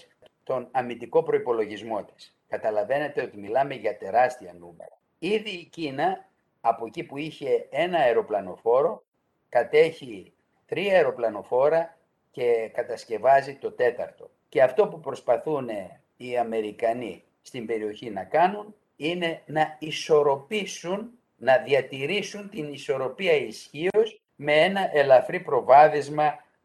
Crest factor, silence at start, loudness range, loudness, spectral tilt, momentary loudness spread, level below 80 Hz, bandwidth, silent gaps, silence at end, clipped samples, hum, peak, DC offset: 20 dB; 0.5 s; 5 LU; -25 LUFS; -5 dB/octave; 14 LU; -72 dBFS; 12.5 kHz; 9.08-9.12 s; 0.25 s; under 0.1%; none; -4 dBFS; under 0.1%